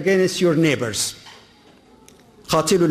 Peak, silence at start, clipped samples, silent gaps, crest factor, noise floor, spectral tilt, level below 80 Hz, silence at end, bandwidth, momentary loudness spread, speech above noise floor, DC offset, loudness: -6 dBFS; 0 s; under 0.1%; none; 14 dB; -50 dBFS; -4.5 dB/octave; -54 dBFS; 0 s; 15.5 kHz; 7 LU; 33 dB; under 0.1%; -19 LUFS